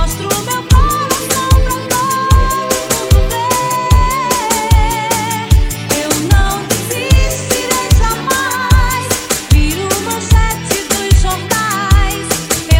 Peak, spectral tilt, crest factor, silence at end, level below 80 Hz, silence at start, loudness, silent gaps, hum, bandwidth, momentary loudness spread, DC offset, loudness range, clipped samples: 0 dBFS; -4 dB/octave; 12 dB; 0 s; -16 dBFS; 0 s; -13 LUFS; none; none; 17.5 kHz; 4 LU; under 0.1%; 1 LU; under 0.1%